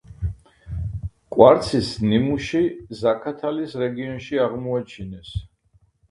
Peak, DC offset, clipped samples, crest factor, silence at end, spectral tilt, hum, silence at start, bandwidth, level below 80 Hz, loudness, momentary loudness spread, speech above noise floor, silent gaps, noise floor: 0 dBFS; under 0.1%; under 0.1%; 22 dB; 0.65 s; -7 dB/octave; none; 0.1 s; 11.5 kHz; -40 dBFS; -22 LUFS; 19 LU; 40 dB; none; -61 dBFS